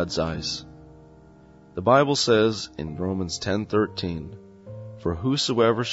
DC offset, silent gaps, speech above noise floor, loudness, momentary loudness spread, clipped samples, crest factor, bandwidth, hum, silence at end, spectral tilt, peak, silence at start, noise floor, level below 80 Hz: under 0.1%; none; 27 dB; -24 LUFS; 19 LU; under 0.1%; 20 dB; 8 kHz; none; 0 s; -5 dB/octave; -4 dBFS; 0 s; -50 dBFS; -48 dBFS